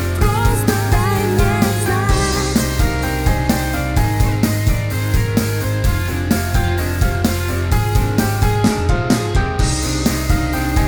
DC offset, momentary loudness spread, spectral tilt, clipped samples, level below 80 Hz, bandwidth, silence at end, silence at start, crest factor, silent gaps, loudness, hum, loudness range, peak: under 0.1%; 3 LU; -5.5 dB/octave; under 0.1%; -22 dBFS; over 20 kHz; 0 s; 0 s; 14 dB; none; -17 LUFS; none; 1 LU; -2 dBFS